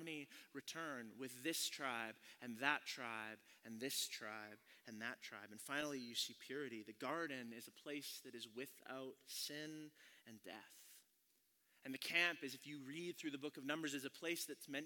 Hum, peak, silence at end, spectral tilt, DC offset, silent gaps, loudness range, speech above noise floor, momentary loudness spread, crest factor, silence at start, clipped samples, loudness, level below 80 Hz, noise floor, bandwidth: none; -22 dBFS; 0 s; -2 dB/octave; under 0.1%; none; 7 LU; 32 dB; 17 LU; 28 dB; 0 s; under 0.1%; -47 LUFS; under -90 dBFS; -80 dBFS; 18 kHz